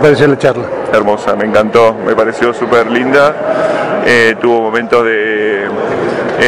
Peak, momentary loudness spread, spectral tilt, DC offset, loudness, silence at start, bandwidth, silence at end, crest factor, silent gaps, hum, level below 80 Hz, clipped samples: 0 dBFS; 6 LU; -5.5 dB/octave; under 0.1%; -11 LUFS; 0 s; 11 kHz; 0 s; 10 dB; none; none; -46 dBFS; 2%